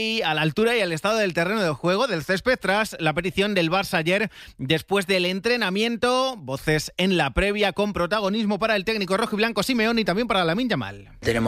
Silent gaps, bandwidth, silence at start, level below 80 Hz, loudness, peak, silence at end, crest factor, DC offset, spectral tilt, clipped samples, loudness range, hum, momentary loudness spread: none; 16 kHz; 0 s; -44 dBFS; -22 LUFS; -6 dBFS; 0 s; 18 dB; under 0.1%; -5 dB/octave; under 0.1%; 1 LU; none; 4 LU